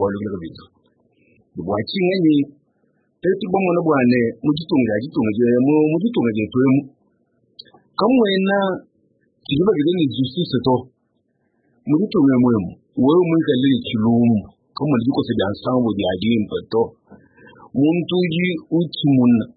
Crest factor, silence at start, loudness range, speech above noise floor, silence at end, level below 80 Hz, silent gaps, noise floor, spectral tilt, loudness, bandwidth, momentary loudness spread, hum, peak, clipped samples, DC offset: 14 dB; 0 s; 4 LU; 49 dB; 0.1 s; -56 dBFS; none; -67 dBFS; -12 dB/octave; -18 LUFS; 5 kHz; 9 LU; none; -4 dBFS; under 0.1%; under 0.1%